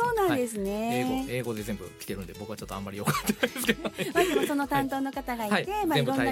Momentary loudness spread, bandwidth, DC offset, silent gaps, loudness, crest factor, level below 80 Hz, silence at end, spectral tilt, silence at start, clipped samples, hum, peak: 12 LU; 17 kHz; under 0.1%; none; -29 LUFS; 20 dB; -50 dBFS; 0 s; -4.5 dB/octave; 0 s; under 0.1%; none; -8 dBFS